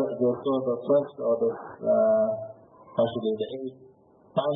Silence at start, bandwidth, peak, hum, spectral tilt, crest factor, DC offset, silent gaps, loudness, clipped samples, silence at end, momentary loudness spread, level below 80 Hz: 0 s; 3.9 kHz; -12 dBFS; none; -11 dB/octave; 16 dB; under 0.1%; none; -26 LUFS; under 0.1%; 0 s; 12 LU; -74 dBFS